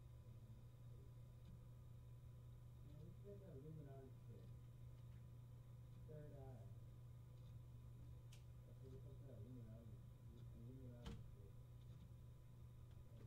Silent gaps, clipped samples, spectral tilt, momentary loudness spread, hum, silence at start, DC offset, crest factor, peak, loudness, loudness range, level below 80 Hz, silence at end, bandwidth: none; under 0.1%; -7.5 dB/octave; 4 LU; none; 0 s; under 0.1%; 18 dB; -42 dBFS; -61 LUFS; 1 LU; -68 dBFS; 0 s; 15.5 kHz